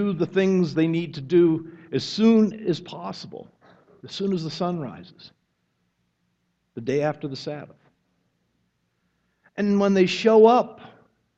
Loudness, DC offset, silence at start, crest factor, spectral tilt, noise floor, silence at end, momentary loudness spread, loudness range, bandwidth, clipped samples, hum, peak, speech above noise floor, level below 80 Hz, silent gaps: -22 LUFS; under 0.1%; 0 s; 20 dB; -7 dB/octave; -72 dBFS; 0.5 s; 20 LU; 11 LU; 8 kHz; under 0.1%; none; -4 dBFS; 51 dB; -66 dBFS; none